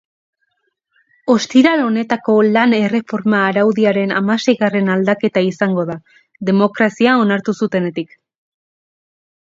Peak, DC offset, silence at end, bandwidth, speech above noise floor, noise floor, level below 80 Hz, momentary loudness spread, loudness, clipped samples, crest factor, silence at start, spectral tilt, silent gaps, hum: 0 dBFS; under 0.1%; 1.5 s; 7.8 kHz; 54 dB; -68 dBFS; -64 dBFS; 8 LU; -15 LUFS; under 0.1%; 16 dB; 1.25 s; -6 dB/octave; none; none